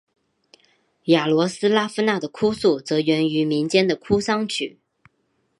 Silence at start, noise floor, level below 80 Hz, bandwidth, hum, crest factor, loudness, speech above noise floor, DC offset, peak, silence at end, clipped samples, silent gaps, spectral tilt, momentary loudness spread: 1.05 s; -69 dBFS; -56 dBFS; 11.5 kHz; none; 20 dB; -21 LUFS; 49 dB; under 0.1%; -2 dBFS; 0.9 s; under 0.1%; none; -5 dB/octave; 5 LU